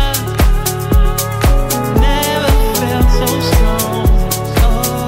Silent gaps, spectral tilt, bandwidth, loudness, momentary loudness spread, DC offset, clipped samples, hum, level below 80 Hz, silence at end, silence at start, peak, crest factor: none; -5 dB/octave; 16.5 kHz; -14 LUFS; 2 LU; under 0.1%; under 0.1%; none; -14 dBFS; 0 s; 0 s; 0 dBFS; 12 dB